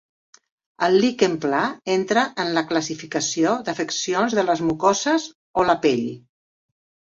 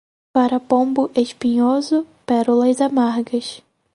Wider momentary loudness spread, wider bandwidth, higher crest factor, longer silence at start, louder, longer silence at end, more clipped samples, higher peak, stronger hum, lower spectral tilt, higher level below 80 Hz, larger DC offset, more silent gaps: about the same, 6 LU vs 6 LU; second, 7.8 kHz vs 11 kHz; about the same, 18 dB vs 16 dB; first, 0.8 s vs 0.35 s; second, -21 LUFS vs -18 LUFS; first, 0.95 s vs 0.35 s; neither; about the same, -4 dBFS vs -2 dBFS; neither; second, -3.5 dB/octave vs -5 dB/octave; about the same, -60 dBFS vs -64 dBFS; neither; first, 5.35-5.54 s vs none